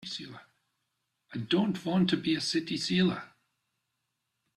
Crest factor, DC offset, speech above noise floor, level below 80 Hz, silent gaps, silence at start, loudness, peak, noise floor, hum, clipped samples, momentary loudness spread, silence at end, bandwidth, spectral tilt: 18 dB; under 0.1%; 53 dB; -68 dBFS; none; 0 s; -29 LUFS; -14 dBFS; -82 dBFS; none; under 0.1%; 13 LU; 1.3 s; 11.5 kHz; -5.5 dB/octave